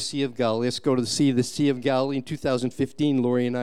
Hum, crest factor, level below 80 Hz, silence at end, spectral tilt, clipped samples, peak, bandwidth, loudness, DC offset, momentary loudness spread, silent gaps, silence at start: none; 14 dB; -60 dBFS; 0 s; -5.5 dB/octave; under 0.1%; -10 dBFS; 13.5 kHz; -24 LUFS; 0.5%; 5 LU; none; 0 s